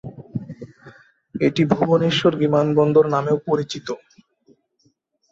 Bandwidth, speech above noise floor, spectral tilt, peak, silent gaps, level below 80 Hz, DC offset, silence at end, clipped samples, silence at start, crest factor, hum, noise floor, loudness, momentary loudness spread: 7.8 kHz; 47 dB; -7 dB/octave; -4 dBFS; none; -58 dBFS; under 0.1%; 1.35 s; under 0.1%; 0.05 s; 18 dB; none; -65 dBFS; -19 LUFS; 19 LU